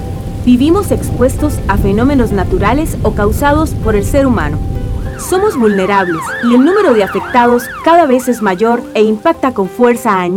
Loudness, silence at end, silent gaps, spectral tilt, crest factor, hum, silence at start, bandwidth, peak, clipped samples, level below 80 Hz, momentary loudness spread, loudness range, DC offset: -11 LUFS; 0 s; none; -6.5 dB/octave; 10 dB; none; 0 s; 18 kHz; 0 dBFS; 0.2%; -22 dBFS; 7 LU; 3 LU; under 0.1%